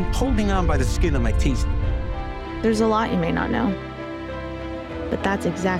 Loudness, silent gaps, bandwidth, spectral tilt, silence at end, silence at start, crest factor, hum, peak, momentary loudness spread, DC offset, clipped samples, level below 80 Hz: -23 LUFS; none; 14.5 kHz; -6.5 dB/octave; 0 s; 0 s; 12 dB; none; -10 dBFS; 11 LU; under 0.1%; under 0.1%; -26 dBFS